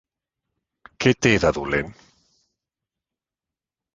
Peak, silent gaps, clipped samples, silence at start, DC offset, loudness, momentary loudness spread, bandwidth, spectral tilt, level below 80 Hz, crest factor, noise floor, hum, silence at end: -2 dBFS; none; under 0.1%; 1 s; under 0.1%; -20 LUFS; 8 LU; 9.8 kHz; -5 dB/octave; -46 dBFS; 24 dB; -89 dBFS; none; 2.05 s